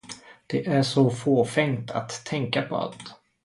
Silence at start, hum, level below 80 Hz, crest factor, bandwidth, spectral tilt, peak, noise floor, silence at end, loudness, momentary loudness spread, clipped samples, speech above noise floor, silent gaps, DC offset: 0.1 s; none; -64 dBFS; 18 dB; 11.5 kHz; -6 dB/octave; -6 dBFS; -45 dBFS; 0.3 s; -25 LUFS; 20 LU; under 0.1%; 20 dB; none; under 0.1%